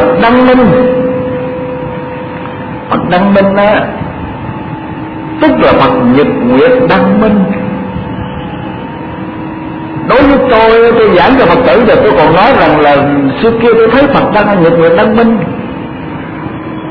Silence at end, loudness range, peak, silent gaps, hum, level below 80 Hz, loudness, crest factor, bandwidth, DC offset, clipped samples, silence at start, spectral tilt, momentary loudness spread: 0 s; 6 LU; 0 dBFS; none; none; -32 dBFS; -7 LUFS; 8 dB; 5.4 kHz; under 0.1%; 0.6%; 0 s; -9.5 dB/octave; 15 LU